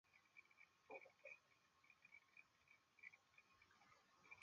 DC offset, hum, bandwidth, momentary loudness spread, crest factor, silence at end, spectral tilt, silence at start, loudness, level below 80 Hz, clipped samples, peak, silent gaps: under 0.1%; none; 7 kHz; 7 LU; 22 dB; 0 s; -1 dB/octave; 0.05 s; -65 LUFS; under -90 dBFS; under 0.1%; -46 dBFS; none